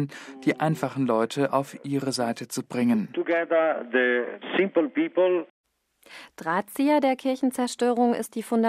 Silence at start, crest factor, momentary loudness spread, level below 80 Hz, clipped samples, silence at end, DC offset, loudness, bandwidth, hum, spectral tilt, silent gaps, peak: 0 s; 16 dB; 7 LU; -76 dBFS; under 0.1%; 0 s; under 0.1%; -25 LUFS; 15.5 kHz; none; -5.5 dB/octave; 5.50-5.64 s; -8 dBFS